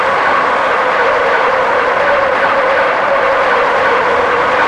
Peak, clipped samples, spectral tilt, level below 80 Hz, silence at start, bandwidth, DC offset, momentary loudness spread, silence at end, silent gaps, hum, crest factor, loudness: 0 dBFS; under 0.1%; -3.5 dB/octave; -46 dBFS; 0 s; 10.5 kHz; under 0.1%; 1 LU; 0 s; none; none; 12 dB; -11 LUFS